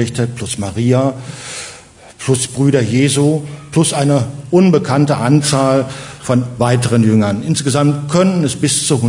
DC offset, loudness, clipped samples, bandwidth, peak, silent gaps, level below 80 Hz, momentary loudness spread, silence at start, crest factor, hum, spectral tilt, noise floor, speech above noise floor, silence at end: under 0.1%; -14 LUFS; under 0.1%; 11 kHz; 0 dBFS; none; -50 dBFS; 11 LU; 0 s; 14 dB; none; -5.5 dB/octave; -38 dBFS; 25 dB; 0 s